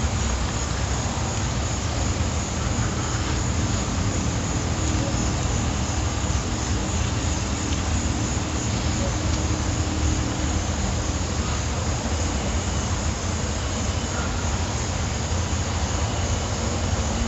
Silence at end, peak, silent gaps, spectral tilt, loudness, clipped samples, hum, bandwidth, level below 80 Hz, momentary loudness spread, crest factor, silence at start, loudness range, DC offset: 0 s; -10 dBFS; none; -4.5 dB/octave; -25 LUFS; under 0.1%; none; 8.2 kHz; -30 dBFS; 2 LU; 14 dB; 0 s; 1 LU; under 0.1%